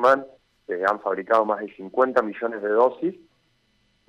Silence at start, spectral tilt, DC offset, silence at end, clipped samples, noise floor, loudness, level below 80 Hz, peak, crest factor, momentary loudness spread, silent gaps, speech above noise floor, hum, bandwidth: 0 s; -6 dB/octave; under 0.1%; 0.95 s; under 0.1%; -66 dBFS; -23 LUFS; -70 dBFS; -6 dBFS; 16 dB; 9 LU; none; 44 dB; none; 9.2 kHz